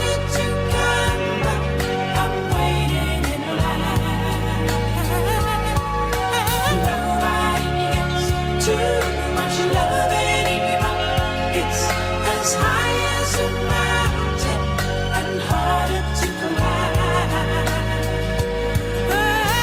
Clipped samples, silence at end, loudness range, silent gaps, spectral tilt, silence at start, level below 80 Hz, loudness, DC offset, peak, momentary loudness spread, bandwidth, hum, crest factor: under 0.1%; 0 s; 2 LU; none; -4.5 dB/octave; 0 s; -28 dBFS; -20 LUFS; under 0.1%; -6 dBFS; 4 LU; 19 kHz; none; 14 dB